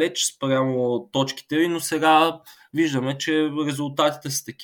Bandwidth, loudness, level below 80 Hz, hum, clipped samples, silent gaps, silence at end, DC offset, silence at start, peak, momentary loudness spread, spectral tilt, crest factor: 19.5 kHz; -22 LUFS; -70 dBFS; none; under 0.1%; none; 0 s; under 0.1%; 0 s; -4 dBFS; 8 LU; -4 dB/octave; 18 dB